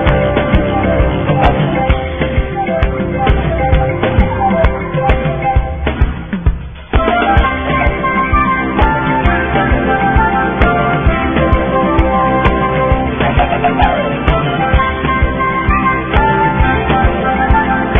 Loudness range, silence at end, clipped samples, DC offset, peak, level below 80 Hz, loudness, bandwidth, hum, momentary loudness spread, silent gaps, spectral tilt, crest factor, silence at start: 2 LU; 0 s; under 0.1%; 0.3%; 0 dBFS; -18 dBFS; -13 LUFS; 3.7 kHz; none; 4 LU; none; -9.5 dB/octave; 12 dB; 0 s